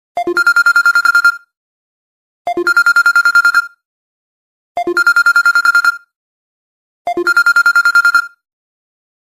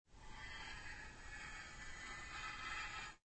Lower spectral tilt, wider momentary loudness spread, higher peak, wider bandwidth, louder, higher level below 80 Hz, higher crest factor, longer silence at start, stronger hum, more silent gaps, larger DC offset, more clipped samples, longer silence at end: second, -0.5 dB/octave vs -2 dB/octave; first, 17 LU vs 8 LU; first, 0 dBFS vs -34 dBFS; first, 15.5 kHz vs 8.4 kHz; first, -10 LUFS vs -50 LUFS; about the same, -62 dBFS vs -60 dBFS; second, 12 dB vs 18 dB; about the same, 0.15 s vs 0.05 s; neither; first, 1.57-2.45 s, 3.85-4.75 s, 6.16-7.05 s vs none; neither; neither; first, 0.95 s vs 0.05 s